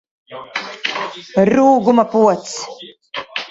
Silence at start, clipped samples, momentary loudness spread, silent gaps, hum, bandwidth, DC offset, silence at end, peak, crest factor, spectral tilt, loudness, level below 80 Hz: 0.3 s; under 0.1%; 19 LU; none; none; 8 kHz; under 0.1%; 0.05 s; 0 dBFS; 16 dB; -5 dB/octave; -16 LUFS; -58 dBFS